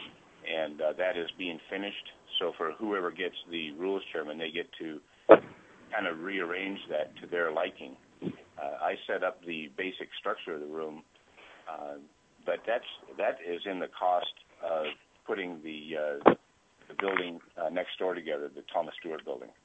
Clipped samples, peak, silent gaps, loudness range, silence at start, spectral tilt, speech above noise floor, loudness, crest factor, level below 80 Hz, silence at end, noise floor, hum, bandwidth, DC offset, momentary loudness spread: under 0.1%; -2 dBFS; none; 8 LU; 0 s; -5.5 dB/octave; 31 dB; -32 LUFS; 30 dB; -76 dBFS; 0.15 s; -63 dBFS; none; 8.2 kHz; under 0.1%; 12 LU